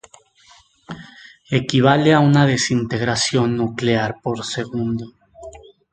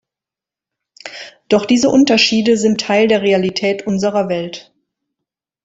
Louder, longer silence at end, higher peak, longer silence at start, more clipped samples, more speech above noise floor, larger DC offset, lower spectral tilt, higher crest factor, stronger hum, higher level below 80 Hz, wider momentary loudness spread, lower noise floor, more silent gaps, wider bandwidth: second, -18 LUFS vs -14 LUFS; second, 0.35 s vs 1.05 s; about the same, 0 dBFS vs 0 dBFS; second, 0.9 s vs 1.05 s; neither; second, 34 dB vs 74 dB; neither; about the same, -5.5 dB/octave vs -4.5 dB/octave; about the same, 20 dB vs 16 dB; neither; first, -50 dBFS vs -56 dBFS; first, 23 LU vs 20 LU; second, -52 dBFS vs -88 dBFS; neither; first, 9.4 kHz vs 8 kHz